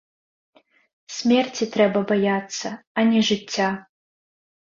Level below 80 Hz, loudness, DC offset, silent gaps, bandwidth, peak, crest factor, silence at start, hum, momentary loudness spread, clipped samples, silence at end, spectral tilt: -66 dBFS; -22 LUFS; under 0.1%; 2.87-2.95 s; 7.6 kHz; -4 dBFS; 18 dB; 1.1 s; none; 11 LU; under 0.1%; 0.85 s; -4.5 dB/octave